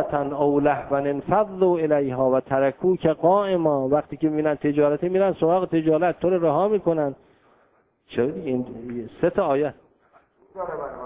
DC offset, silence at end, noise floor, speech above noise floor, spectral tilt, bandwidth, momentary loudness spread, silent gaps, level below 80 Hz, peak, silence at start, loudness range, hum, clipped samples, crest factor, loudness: under 0.1%; 0 s; -63 dBFS; 41 dB; -11.5 dB/octave; 3.9 kHz; 9 LU; none; -56 dBFS; -6 dBFS; 0 s; 6 LU; none; under 0.1%; 16 dB; -22 LUFS